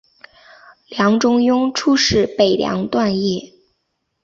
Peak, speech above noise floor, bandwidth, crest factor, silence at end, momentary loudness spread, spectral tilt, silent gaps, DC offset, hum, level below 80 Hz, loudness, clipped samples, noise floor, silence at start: -2 dBFS; 56 dB; 7.8 kHz; 16 dB; 0.8 s; 7 LU; -4.5 dB/octave; none; under 0.1%; none; -46 dBFS; -16 LUFS; under 0.1%; -72 dBFS; 0.9 s